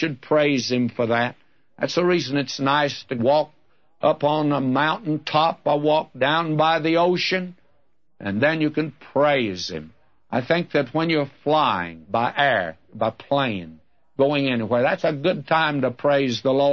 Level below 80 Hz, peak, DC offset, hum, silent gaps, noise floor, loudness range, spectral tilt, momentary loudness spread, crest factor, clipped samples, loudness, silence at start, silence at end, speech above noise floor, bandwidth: -64 dBFS; -4 dBFS; 0.2%; none; none; -68 dBFS; 2 LU; -5.5 dB/octave; 8 LU; 18 dB; under 0.1%; -22 LUFS; 0 s; 0 s; 47 dB; 7 kHz